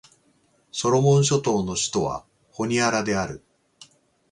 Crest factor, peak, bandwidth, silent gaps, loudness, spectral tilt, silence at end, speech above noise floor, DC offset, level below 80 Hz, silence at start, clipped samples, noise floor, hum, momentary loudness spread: 18 dB; -8 dBFS; 11 kHz; none; -23 LUFS; -4.5 dB/octave; 0.95 s; 42 dB; under 0.1%; -54 dBFS; 0.75 s; under 0.1%; -63 dBFS; none; 16 LU